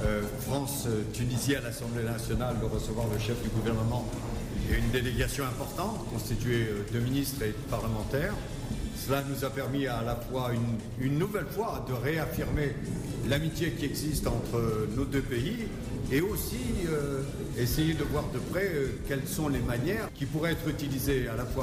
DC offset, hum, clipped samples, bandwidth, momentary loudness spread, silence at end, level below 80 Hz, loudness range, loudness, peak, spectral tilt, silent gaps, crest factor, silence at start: under 0.1%; none; under 0.1%; 16 kHz; 5 LU; 0 s; -40 dBFS; 1 LU; -31 LUFS; -18 dBFS; -5.5 dB/octave; none; 12 dB; 0 s